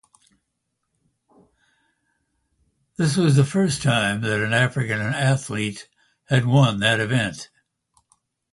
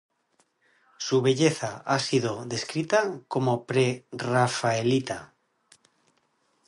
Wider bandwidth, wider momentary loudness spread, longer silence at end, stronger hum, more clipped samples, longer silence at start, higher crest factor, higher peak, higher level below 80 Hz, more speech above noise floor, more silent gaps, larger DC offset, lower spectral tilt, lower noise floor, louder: about the same, 11.5 kHz vs 11.5 kHz; first, 11 LU vs 8 LU; second, 1.05 s vs 1.4 s; neither; neither; first, 3 s vs 1 s; about the same, 20 dB vs 20 dB; first, -4 dBFS vs -8 dBFS; first, -56 dBFS vs -68 dBFS; first, 57 dB vs 45 dB; neither; neither; about the same, -5.5 dB/octave vs -5 dB/octave; first, -77 dBFS vs -70 dBFS; first, -21 LUFS vs -26 LUFS